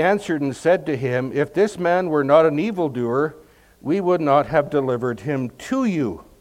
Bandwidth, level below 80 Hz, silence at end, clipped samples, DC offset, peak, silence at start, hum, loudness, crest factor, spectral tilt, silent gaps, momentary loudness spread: 15.5 kHz; -56 dBFS; 0.2 s; under 0.1%; under 0.1%; -2 dBFS; 0 s; none; -20 LUFS; 18 dB; -7 dB/octave; none; 9 LU